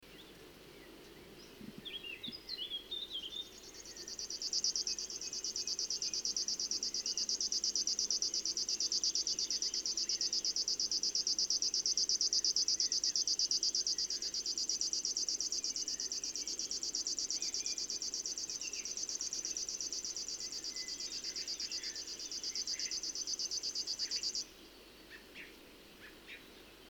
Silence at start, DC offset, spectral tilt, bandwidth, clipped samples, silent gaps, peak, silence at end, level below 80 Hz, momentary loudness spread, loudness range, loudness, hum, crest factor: 0 s; under 0.1%; 1.5 dB/octave; over 20 kHz; under 0.1%; none; -20 dBFS; 0 s; -70 dBFS; 20 LU; 8 LU; -35 LUFS; none; 20 dB